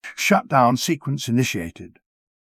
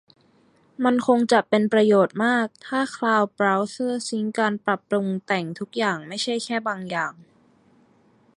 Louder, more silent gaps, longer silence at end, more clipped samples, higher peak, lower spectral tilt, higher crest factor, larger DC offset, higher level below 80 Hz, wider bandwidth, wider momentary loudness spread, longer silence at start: first, -20 LUFS vs -23 LUFS; neither; second, 0.75 s vs 1.25 s; neither; about the same, -4 dBFS vs -4 dBFS; about the same, -5 dB/octave vs -5 dB/octave; about the same, 18 dB vs 18 dB; neither; first, -54 dBFS vs -72 dBFS; first, 16 kHz vs 11.5 kHz; about the same, 9 LU vs 8 LU; second, 0.05 s vs 0.8 s